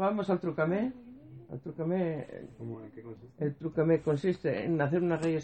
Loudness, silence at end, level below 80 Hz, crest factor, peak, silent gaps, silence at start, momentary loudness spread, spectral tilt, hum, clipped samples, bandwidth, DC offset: -31 LUFS; 0 s; -66 dBFS; 16 dB; -16 dBFS; none; 0 s; 19 LU; -8.5 dB/octave; none; under 0.1%; 8.8 kHz; under 0.1%